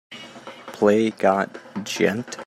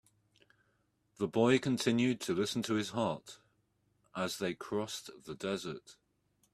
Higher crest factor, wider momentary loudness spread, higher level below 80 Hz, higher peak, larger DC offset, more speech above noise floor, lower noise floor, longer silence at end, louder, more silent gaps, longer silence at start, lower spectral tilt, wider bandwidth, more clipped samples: about the same, 20 dB vs 22 dB; first, 20 LU vs 16 LU; about the same, -68 dBFS vs -72 dBFS; first, -4 dBFS vs -14 dBFS; neither; second, 19 dB vs 42 dB; second, -40 dBFS vs -76 dBFS; second, 0 s vs 0.6 s; first, -21 LUFS vs -34 LUFS; neither; second, 0.1 s vs 1.2 s; about the same, -5 dB/octave vs -5 dB/octave; about the same, 14.5 kHz vs 14 kHz; neither